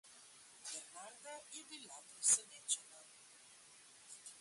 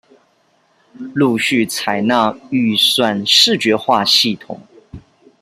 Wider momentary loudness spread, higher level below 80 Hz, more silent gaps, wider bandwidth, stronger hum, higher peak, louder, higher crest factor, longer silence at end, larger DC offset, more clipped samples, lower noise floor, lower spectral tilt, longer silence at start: first, 27 LU vs 16 LU; second, under -90 dBFS vs -56 dBFS; neither; second, 11.5 kHz vs 16 kHz; neither; second, -20 dBFS vs 0 dBFS; second, -39 LUFS vs -13 LUFS; first, 26 dB vs 16 dB; second, 0 s vs 0.4 s; neither; neither; first, -63 dBFS vs -58 dBFS; second, 2 dB/octave vs -3 dB/octave; second, 0.05 s vs 1 s